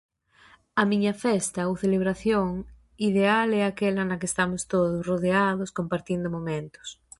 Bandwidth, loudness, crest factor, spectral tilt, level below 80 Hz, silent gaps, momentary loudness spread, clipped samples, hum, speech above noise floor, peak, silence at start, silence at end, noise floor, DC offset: 11.5 kHz; -25 LUFS; 18 dB; -5.5 dB/octave; -54 dBFS; none; 8 LU; under 0.1%; none; 32 dB; -8 dBFS; 0.75 s; 0.25 s; -57 dBFS; under 0.1%